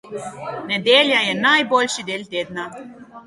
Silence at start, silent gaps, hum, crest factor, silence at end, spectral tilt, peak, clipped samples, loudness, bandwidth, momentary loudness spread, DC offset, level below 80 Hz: 0.05 s; none; none; 20 dB; 0.05 s; -2.5 dB/octave; -2 dBFS; under 0.1%; -17 LUFS; 11.5 kHz; 17 LU; under 0.1%; -64 dBFS